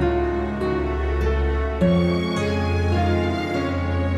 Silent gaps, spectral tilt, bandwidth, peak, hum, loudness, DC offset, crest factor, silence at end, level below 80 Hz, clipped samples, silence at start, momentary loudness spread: none; -7.5 dB/octave; 10.5 kHz; -8 dBFS; none; -22 LUFS; under 0.1%; 12 dB; 0 s; -28 dBFS; under 0.1%; 0 s; 4 LU